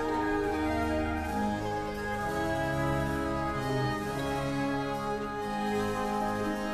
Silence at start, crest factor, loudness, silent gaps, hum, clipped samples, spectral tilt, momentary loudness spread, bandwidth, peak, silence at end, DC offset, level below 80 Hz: 0 s; 12 dB; -31 LUFS; none; none; under 0.1%; -6 dB/octave; 3 LU; 14 kHz; -18 dBFS; 0 s; under 0.1%; -44 dBFS